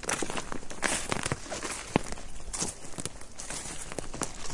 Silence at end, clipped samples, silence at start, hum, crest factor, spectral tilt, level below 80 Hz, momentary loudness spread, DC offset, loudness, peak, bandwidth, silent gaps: 0 s; under 0.1%; 0 s; none; 30 dB; -2.5 dB/octave; -46 dBFS; 10 LU; under 0.1%; -34 LUFS; -4 dBFS; 11.5 kHz; none